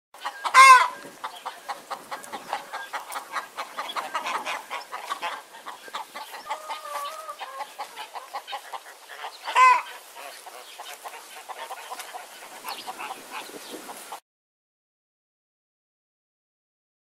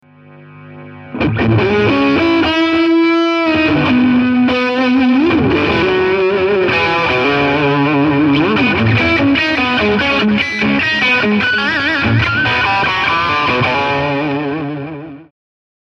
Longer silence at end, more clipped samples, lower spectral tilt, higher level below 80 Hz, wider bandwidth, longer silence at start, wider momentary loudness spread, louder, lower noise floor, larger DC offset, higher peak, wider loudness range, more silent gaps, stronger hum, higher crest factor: first, 2.85 s vs 0.7 s; neither; second, 1.5 dB/octave vs -6.5 dB/octave; second, -84 dBFS vs -38 dBFS; first, 16 kHz vs 7.4 kHz; second, 0.15 s vs 0.4 s; first, 22 LU vs 4 LU; second, -22 LUFS vs -12 LUFS; about the same, -43 dBFS vs -40 dBFS; neither; about the same, -2 dBFS vs -2 dBFS; first, 15 LU vs 2 LU; neither; neither; first, 26 dB vs 12 dB